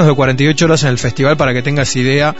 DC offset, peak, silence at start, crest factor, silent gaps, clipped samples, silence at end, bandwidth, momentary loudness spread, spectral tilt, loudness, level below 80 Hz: 4%; 0 dBFS; 0 s; 12 dB; none; under 0.1%; 0 s; 8 kHz; 4 LU; -5 dB/octave; -12 LUFS; -38 dBFS